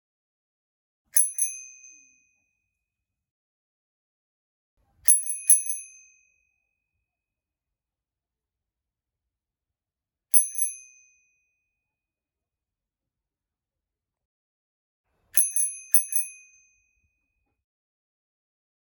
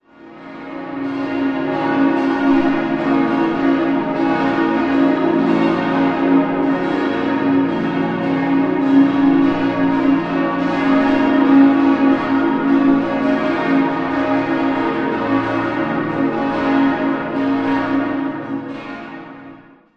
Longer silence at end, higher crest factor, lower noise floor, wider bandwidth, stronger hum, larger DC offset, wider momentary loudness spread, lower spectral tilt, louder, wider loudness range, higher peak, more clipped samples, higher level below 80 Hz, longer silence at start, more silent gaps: first, 2.65 s vs 0.35 s; first, 30 dB vs 16 dB; first, under -90 dBFS vs -41 dBFS; first, 19.5 kHz vs 6 kHz; neither; neither; first, 13 LU vs 9 LU; second, 3.5 dB/octave vs -7.5 dB/octave; second, -21 LUFS vs -17 LUFS; about the same, 5 LU vs 4 LU; about the same, -2 dBFS vs -2 dBFS; neither; second, -80 dBFS vs -50 dBFS; first, 1.15 s vs 0.2 s; first, 3.31-4.77 s, 14.25-15.04 s vs none